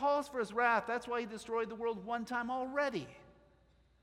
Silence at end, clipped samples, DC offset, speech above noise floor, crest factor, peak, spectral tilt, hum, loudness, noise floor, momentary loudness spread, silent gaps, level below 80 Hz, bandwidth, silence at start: 0.7 s; under 0.1%; under 0.1%; 32 dB; 20 dB; -16 dBFS; -4.5 dB/octave; none; -36 LUFS; -68 dBFS; 8 LU; none; -70 dBFS; 15 kHz; 0 s